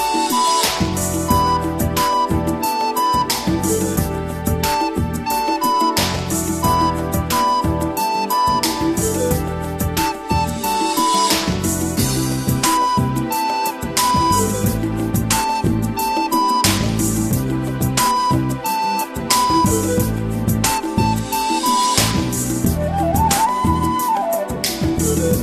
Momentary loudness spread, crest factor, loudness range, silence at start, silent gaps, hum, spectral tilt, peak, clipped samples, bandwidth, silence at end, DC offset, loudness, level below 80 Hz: 5 LU; 18 dB; 1 LU; 0 s; none; none; -4 dB/octave; 0 dBFS; under 0.1%; 14 kHz; 0 s; under 0.1%; -18 LUFS; -32 dBFS